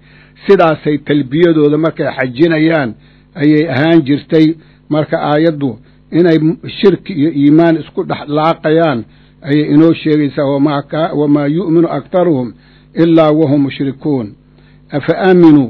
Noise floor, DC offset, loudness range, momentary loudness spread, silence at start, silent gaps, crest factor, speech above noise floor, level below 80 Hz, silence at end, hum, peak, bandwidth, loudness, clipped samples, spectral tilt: -43 dBFS; under 0.1%; 1 LU; 10 LU; 0.45 s; none; 12 dB; 32 dB; -48 dBFS; 0 s; none; 0 dBFS; 6 kHz; -12 LUFS; 0.8%; -9.5 dB/octave